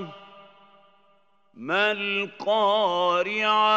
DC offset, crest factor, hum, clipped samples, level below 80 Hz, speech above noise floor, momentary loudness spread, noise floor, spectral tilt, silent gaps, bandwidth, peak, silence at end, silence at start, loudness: under 0.1%; 16 dB; none; under 0.1%; -88 dBFS; 41 dB; 6 LU; -64 dBFS; -4 dB/octave; none; 8 kHz; -8 dBFS; 0 s; 0 s; -23 LUFS